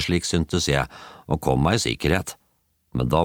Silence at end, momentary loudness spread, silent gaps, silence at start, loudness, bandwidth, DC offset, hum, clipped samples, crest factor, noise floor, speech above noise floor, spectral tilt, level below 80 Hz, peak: 0 s; 12 LU; none; 0 s; -23 LUFS; 19 kHz; under 0.1%; none; under 0.1%; 18 dB; -68 dBFS; 45 dB; -5 dB/octave; -38 dBFS; -4 dBFS